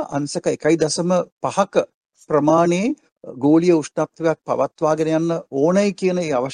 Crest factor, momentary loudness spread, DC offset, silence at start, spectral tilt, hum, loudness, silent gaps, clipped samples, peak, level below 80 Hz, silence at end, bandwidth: 18 dB; 8 LU; under 0.1%; 0 s; -6 dB/octave; none; -19 LUFS; 1.32-1.41 s, 1.94-2.10 s, 3.12-3.16 s; under 0.1%; -2 dBFS; -62 dBFS; 0 s; 10.5 kHz